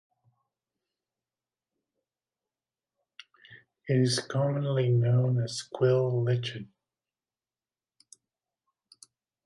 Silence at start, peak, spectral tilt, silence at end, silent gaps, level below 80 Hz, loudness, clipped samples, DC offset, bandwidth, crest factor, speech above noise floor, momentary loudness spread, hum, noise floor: 3.5 s; -14 dBFS; -6.5 dB/octave; 2.8 s; none; -72 dBFS; -27 LUFS; under 0.1%; under 0.1%; 11.5 kHz; 18 dB; over 64 dB; 10 LU; none; under -90 dBFS